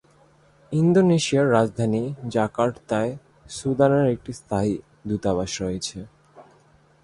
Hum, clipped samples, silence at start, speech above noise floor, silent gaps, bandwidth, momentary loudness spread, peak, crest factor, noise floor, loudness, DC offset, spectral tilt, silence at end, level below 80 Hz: none; under 0.1%; 0.7 s; 35 dB; none; 11.5 kHz; 12 LU; -4 dBFS; 20 dB; -57 dBFS; -23 LUFS; under 0.1%; -6 dB/octave; 0.6 s; -52 dBFS